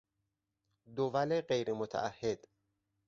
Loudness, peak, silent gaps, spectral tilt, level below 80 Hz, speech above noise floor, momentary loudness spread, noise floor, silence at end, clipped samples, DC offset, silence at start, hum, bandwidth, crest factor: -36 LUFS; -18 dBFS; none; -4.5 dB/octave; -72 dBFS; 51 dB; 8 LU; -86 dBFS; 0.7 s; under 0.1%; under 0.1%; 0.9 s; none; 7.6 kHz; 20 dB